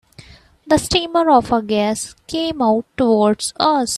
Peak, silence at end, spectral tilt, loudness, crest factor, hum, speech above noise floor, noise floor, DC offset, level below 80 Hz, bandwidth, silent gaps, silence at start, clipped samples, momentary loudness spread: 0 dBFS; 0 s; -4 dB/octave; -17 LUFS; 16 dB; none; 27 dB; -44 dBFS; under 0.1%; -44 dBFS; 14.5 kHz; none; 0.2 s; under 0.1%; 8 LU